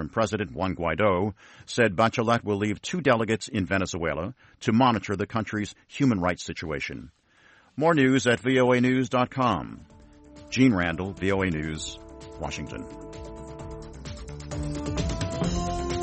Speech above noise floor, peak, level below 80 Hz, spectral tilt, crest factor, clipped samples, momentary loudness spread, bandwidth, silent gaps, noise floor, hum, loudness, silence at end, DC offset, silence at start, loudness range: 33 dB; -8 dBFS; -44 dBFS; -5.5 dB/octave; 18 dB; under 0.1%; 19 LU; 8.8 kHz; none; -58 dBFS; none; -26 LUFS; 0 s; under 0.1%; 0 s; 9 LU